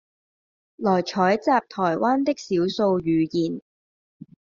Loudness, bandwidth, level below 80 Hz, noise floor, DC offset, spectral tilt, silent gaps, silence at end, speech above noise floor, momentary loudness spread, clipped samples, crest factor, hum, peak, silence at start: -23 LUFS; 7.4 kHz; -62 dBFS; under -90 dBFS; under 0.1%; -5 dB/octave; none; 1 s; over 68 dB; 5 LU; under 0.1%; 18 dB; none; -6 dBFS; 0.8 s